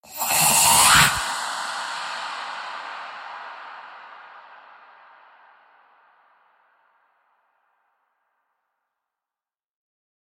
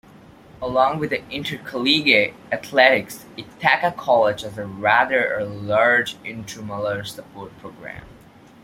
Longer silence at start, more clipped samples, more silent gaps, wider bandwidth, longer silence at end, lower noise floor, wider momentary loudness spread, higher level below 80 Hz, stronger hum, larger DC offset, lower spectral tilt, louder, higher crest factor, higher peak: second, 0.05 s vs 0.6 s; neither; neither; about the same, 16.5 kHz vs 16.5 kHz; first, 5.65 s vs 0.5 s; first, under -90 dBFS vs -47 dBFS; first, 26 LU vs 21 LU; about the same, -52 dBFS vs -56 dBFS; neither; neither; second, 0 dB/octave vs -4 dB/octave; about the same, -18 LUFS vs -19 LUFS; about the same, 24 dB vs 20 dB; about the same, -2 dBFS vs 0 dBFS